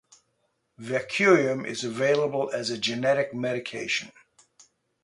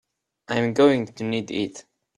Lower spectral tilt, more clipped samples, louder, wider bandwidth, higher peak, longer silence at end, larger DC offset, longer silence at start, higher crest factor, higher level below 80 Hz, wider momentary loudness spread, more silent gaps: second, -4.5 dB/octave vs -6 dB/octave; neither; about the same, -25 LUFS vs -23 LUFS; about the same, 11.5 kHz vs 11 kHz; about the same, -6 dBFS vs -6 dBFS; first, 0.95 s vs 0.4 s; neither; first, 0.8 s vs 0.5 s; about the same, 20 dB vs 18 dB; second, -72 dBFS vs -62 dBFS; about the same, 11 LU vs 10 LU; neither